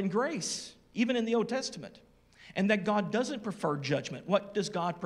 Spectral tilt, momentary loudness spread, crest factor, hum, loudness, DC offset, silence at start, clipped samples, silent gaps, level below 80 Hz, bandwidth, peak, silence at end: -4.5 dB/octave; 10 LU; 20 dB; none; -32 LUFS; under 0.1%; 0 s; under 0.1%; none; -70 dBFS; 12.5 kHz; -12 dBFS; 0 s